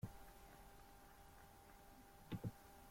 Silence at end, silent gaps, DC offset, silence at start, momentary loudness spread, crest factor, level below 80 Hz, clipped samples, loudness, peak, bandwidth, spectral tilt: 0 s; none; under 0.1%; 0 s; 13 LU; 20 dB; -68 dBFS; under 0.1%; -58 LUFS; -36 dBFS; 16.5 kHz; -6 dB/octave